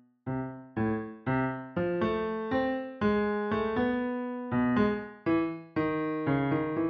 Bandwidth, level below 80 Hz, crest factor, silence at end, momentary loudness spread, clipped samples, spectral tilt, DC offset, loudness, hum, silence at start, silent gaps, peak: 5.8 kHz; -56 dBFS; 16 dB; 0 s; 6 LU; under 0.1%; -6.5 dB/octave; under 0.1%; -30 LUFS; none; 0.25 s; none; -14 dBFS